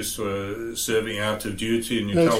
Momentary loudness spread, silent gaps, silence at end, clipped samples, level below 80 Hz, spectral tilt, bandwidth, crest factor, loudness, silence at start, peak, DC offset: 5 LU; none; 0 s; under 0.1%; -46 dBFS; -4 dB/octave; 16.5 kHz; 16 dB; -25 LUFS; 0 s; -8 dBFS; under 0.1%